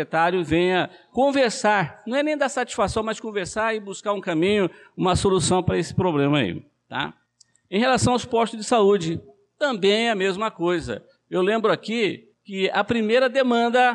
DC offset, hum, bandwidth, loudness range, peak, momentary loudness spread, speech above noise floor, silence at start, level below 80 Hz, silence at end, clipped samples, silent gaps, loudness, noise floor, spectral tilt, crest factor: under 0.1%; none; 11 kHz; 2 LU; -8 dBFS; 9 LU; 39 dB; 0 s; -48 dBFS; 0 s; under 0.1%; none; -22 LUFS; -61 dBFS; -5 dB/octave; 14 dB